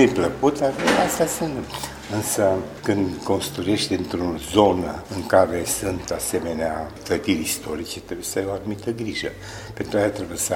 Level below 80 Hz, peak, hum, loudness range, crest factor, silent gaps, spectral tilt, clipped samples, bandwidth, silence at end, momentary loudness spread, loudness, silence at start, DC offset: -46 dBFS; 0 dBFS; none; 4 LU; 22 dB; none; -4 dB/octave; under 0.1%; 16.5 kHz; 0 s; 11 LU; -23 LUFS; 0 s; under 0.1%